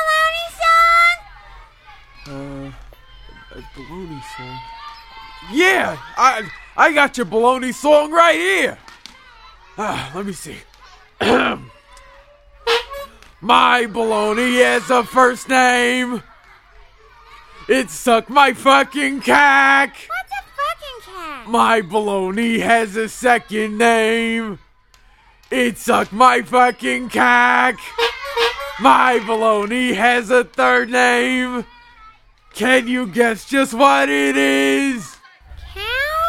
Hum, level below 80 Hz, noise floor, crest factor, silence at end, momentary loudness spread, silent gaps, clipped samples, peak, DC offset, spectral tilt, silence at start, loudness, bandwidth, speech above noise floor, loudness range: none; -48 dBFS; -51 dBFS; 18 dB; 0 s; 20 LU; none; under 0.1%; 0 dBFS; under 0.1%; -3 dB/octave; 0 s; -15 LUFS; 16.5 kHz; 35 dB; 8 LU